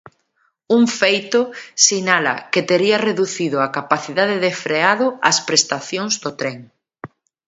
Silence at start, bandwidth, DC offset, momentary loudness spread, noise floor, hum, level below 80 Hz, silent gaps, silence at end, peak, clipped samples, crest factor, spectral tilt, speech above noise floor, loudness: 0.7 s; 8 kHz; under 0.1%; 8 LU; -65 dBFS; none; -68 dBFS; none; 0.4 s; 0 dBFS; under 0.1%; 18 dB; -2.5 dB/octave; 48 dB; -17 LUFS